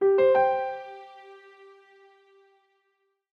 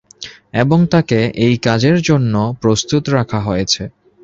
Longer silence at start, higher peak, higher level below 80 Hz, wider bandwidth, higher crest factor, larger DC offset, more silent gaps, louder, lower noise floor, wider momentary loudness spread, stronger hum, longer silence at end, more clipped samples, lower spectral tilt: second, 0 s vs 0.2 s; second, -12 dBFS vs -2 dBFS; second, -70 dBFS vs -42 dBFS; second, 5.2 kHz vs 7.8 kHz; about the same, 16 dB vs 14 dB; neither; neither; second, -23 LUFS vs -15 LUFS; first, -75 dBFS vs -36 dBFS; first, 27 LU vs 7 LU; neither; first, 2 s vs 0.35 s; neither; first, -7 dB/octave vs -5.5 dB/octave